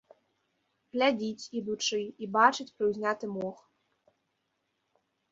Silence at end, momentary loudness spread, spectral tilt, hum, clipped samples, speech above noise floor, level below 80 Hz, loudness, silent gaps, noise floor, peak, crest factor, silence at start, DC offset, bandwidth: 1.8 s; 13 LU; -3.5 dB/octave; none; under 0.1%; 50 dB; -76 dBFS; -30 LUFS; none; -79 dBFS; -8 dBFS; 24 dB; 0.95 s; under 0.1%; 7.8 kHz